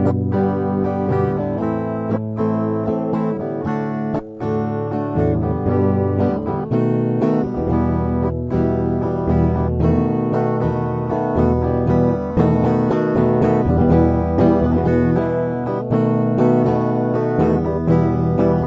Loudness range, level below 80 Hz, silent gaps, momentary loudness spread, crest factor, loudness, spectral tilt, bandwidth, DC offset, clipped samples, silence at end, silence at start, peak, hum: 5 LU; -32 dBFS; none; 6 LU; 16 dB; -18 LUFS; -11 dB/octave; 6.2 kHz; under 0.1%; under 0.1%; 0 s; 0 s; -2 dBFS; none